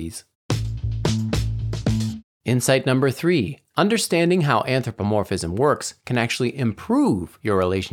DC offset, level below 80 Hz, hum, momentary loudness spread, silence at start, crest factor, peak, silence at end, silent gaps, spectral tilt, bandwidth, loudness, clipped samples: under 0.1%; -38 dBFS; none; 8 LU; 0 s; 18 dB; -4 dBFS; 0 s; 0.35-0.49 s, 2.24-2.40 s; -5.5 dB/octave; 17.5 kHz; -22 LUFS; under 0.1%